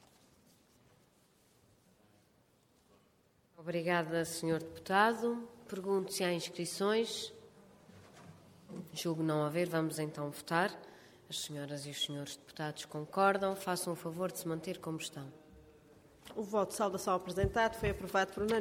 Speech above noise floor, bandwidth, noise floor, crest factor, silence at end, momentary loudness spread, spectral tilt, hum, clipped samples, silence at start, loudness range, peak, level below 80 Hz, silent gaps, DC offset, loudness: 35 dB; 17 kHz; -70 dBFS; 22 dB; 0 s; 14 LU; -4.5 dB/octave; none; under 0.1%; 3.6 s; 5 LU; -16 dBFS; -60 dBFS; none; under 0.1%; -36 LUFS